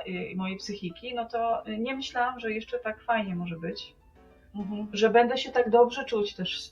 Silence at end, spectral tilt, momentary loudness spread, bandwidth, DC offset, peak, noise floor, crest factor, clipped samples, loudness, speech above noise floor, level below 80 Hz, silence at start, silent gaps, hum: 0 s; -5 dB/octave; 14 LU; 7.4 kHz; under 0.1%; -8 dBFS; -56 dBFS; 20 dB; under 0.1%; -28 LUFS; 28 dB; -60 dBFS; 0 s; none; none